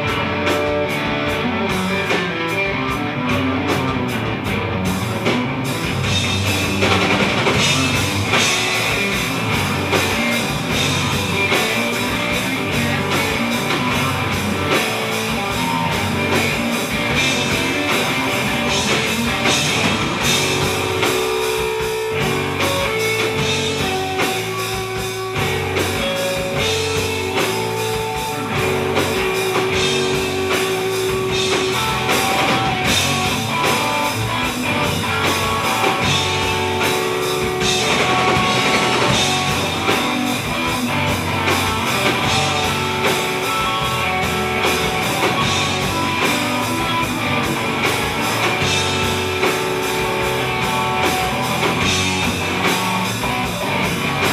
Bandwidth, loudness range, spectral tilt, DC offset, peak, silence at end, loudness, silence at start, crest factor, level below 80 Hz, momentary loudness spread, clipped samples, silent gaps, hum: 16 kHz; 3 LU; -3.5 dB/octave; under 0.1%; -2 dBFS; 0 s; -18 LUFS; 0 s; 18 dB; -40 dBFS; 4 LU; under 0.1%; none; none